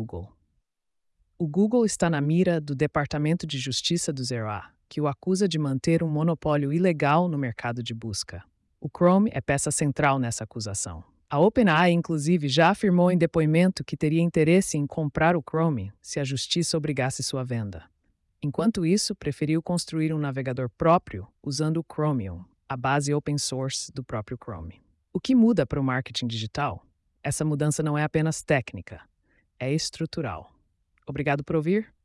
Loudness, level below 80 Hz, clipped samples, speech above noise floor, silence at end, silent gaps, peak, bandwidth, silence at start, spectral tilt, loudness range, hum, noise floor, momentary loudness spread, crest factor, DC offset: -25 LUFS; -54 dBFS; under 0.1%; 54 dB; 0.2 s; none; -10 dBFS; 12 kHz; 0 s; -5.5 dB/octave; 6 LU; none; -79 dBFS; 14 LU; 16 dB; under 0.1%